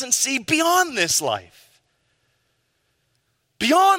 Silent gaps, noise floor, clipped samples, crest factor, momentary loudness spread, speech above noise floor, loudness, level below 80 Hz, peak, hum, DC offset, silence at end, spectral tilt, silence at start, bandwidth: none; -70 dBFS; under 0.1%; 18 dB; 8 LU; 50 dB; -19 LUFS; -64 dBFS; -4 dBFS; none; under 0.1%; 0 s; -1.5 dB/octave; 0 s; 16.5 kHz